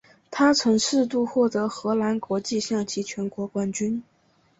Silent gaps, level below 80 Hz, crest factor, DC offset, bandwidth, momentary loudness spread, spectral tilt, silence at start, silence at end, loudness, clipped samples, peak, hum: none; -64 dBFS; 18 dB; under 0.1%; 8.2 kHz; 9 LU; -4 dB/octave; 0.3 s; 0.6 s; -24 LUFS; under 0.1%; -6 dBFS; none